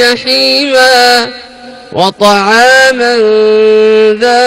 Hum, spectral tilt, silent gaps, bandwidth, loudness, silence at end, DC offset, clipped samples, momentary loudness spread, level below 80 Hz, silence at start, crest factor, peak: none; -2.5 dB/octave; none; 16.5 kHz; -6 LUFS; 0 s; under 0.1%; 2%; 8 LU; -48 dBFS; 0 s; 6 dB; 0 dBFS